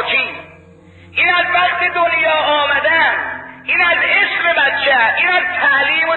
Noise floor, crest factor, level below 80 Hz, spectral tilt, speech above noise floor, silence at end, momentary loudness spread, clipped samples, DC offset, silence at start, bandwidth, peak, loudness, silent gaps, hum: -42 dBFS; 12 dB; -50 dBFS; -5 dB/octave; 28 dB; 0 s; 7 LU; under 0.1%; under 0.1%; 0 s; 4.3 kHz; -2 dBFS; -13 LUFS; none; none